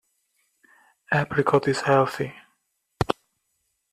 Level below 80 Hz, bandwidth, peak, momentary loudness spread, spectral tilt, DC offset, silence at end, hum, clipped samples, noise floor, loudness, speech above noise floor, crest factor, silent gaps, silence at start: -52 dBFS; 14 kHz; -2 dBFS; 11 LU; -6 dB/octave; under 0.1%; 0.8 s; none; under 0.1%; -75 dBFS; -24 LUFS; 53 dB; 24 dB; none; 1.1 s